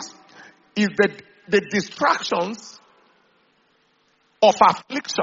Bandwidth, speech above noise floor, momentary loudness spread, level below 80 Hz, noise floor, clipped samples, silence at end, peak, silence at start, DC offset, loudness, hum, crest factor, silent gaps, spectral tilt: 7.6 kHz; 43 dB; 15 LU; -66 dBFS; -63 dBFS; under 0.1%; 0 s; 0 dBFS; 0 s; under 0.1%; -20 LUFS; none; 22 dB; none; -2.5 dB/octave